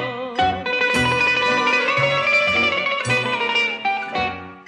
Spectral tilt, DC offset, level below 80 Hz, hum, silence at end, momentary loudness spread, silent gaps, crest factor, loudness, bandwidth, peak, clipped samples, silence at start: -3.5 dB/octave; under 0.1%; -50 dBFS; none; 0.05 s; 7 LU; none; 12 dB; -18 LUFS; 12 kHz; -8 dBFS; under 0.1%; 0 s